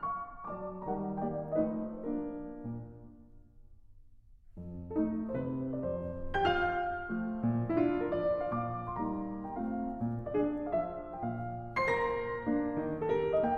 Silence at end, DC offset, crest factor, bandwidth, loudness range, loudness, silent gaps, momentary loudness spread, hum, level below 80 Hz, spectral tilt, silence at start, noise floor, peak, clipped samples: 0 s; under 0.1%; 16 dB; 8.4 kHz; 7 LU; -35 LUFS; none; 11 LU; none; -52 dBFS; -8.5 dB/octave; 0 s; -56 dBFS; -18 dBFS; under 0.1%